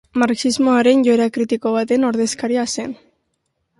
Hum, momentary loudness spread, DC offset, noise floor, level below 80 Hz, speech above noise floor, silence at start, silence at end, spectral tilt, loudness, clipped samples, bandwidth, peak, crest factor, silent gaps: none; 10 LU; under 0.1%; -71 dBFS; -60 dBFS; 55 dB; 0.15 s; 0.85 s; -4 dB/octave; -17 LUFS; under 0.1%; 11.5 kHz; -2 dBFS; 16 dB; none